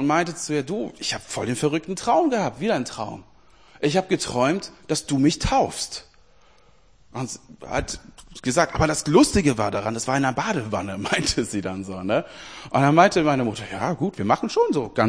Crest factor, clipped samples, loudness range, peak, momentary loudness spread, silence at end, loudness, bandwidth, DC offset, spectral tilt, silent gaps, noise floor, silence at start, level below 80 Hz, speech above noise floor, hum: 22 dB; under 0.1%; 5 LU; 0 dBFS; 14 LU; 0 s; -23 LUFS; 10.5 kHz; 0.2%; -4.5 dB/octave; none; -57 dBFS; 0 s; -44 dBFS; 35 dB; none